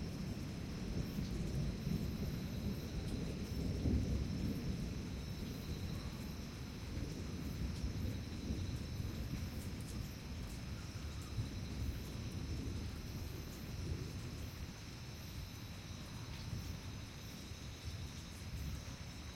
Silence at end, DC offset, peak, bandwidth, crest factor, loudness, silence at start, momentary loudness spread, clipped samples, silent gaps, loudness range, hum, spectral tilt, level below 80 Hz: 0 s; under 0.1%; -26 dBFS; 16.5 kHz; 18 dB; -45 LUFS; 0 s; 8 LU; under 0.1%; none; 6 LU; none; -6 dB/octave; -50 dBFS